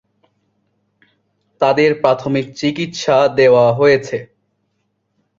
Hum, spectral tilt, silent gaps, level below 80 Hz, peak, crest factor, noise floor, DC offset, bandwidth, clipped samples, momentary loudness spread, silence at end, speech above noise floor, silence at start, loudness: none; -5.5 dB/octave; none; -56 dBFS; 0 dBFS; 16 dB; -68 dBFS; under 0.1%; 7.6 kHz; under 0.1%; 10 LU; 1.15 s; 54 dB; 1.6 s; -14 LUFS